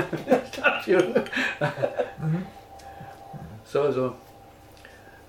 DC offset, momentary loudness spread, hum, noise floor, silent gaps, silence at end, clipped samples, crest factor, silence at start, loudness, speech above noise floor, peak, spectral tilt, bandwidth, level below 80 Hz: under 0.1%; 21 LU; none; -49 dBFS; none; 0.05 s; under 0.1%; 20 dB; 0 s; -25 LUFS; 24 dB; -6 dBFS; -6 dB/octave; 17 kHz; -58 dBFS